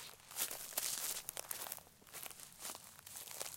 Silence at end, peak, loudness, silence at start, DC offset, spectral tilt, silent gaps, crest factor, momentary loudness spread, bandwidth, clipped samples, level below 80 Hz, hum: 0 s; -18 dBFS; -44 LUFS; 0 s; under 0.1%; 0.5 dB/octave; none; 30 dB; 11 LU; 17 kHz; under 0.1%; -76 dBFS; none